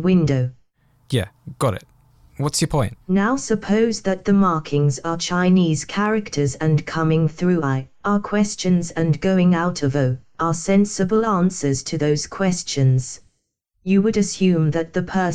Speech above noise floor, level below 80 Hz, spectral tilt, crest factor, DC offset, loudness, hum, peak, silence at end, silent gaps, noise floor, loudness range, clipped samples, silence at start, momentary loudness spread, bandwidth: 52 dB; -46 dBFS; -6 dB/octave; 12 dB; under 0.1%; -20 LUFS; none; -6 dBFS; 0 s; none; -71 dBFS; 3 LU; under 0.1%; 0 s; 7 LU; 12.5 kHz